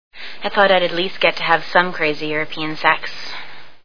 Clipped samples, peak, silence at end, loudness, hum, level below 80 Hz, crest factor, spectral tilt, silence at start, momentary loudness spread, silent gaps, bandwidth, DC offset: under 0.1%; 0 dBFS; 0 s; -18 LUFS; none; -56 dBFS; 20 dB; -5 dB/octave; 0.1 s; 16 LU; none; 5.4 kHz; 4%